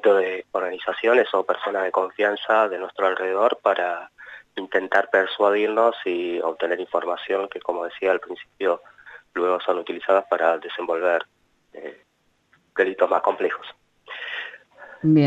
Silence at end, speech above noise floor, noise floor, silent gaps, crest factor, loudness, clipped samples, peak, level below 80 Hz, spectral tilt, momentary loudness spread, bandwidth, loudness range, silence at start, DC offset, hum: 0 s; 42 dB; -64 dBFS; none; 18 dB; -23 LUFS; under 0.1%; -4 dBFS; -72 dBFS; -7 dB/octave; 14 LU; 8 kHz; 4 LU; 0.05 s; under 0.1%; 50 Hz at -75 dBFS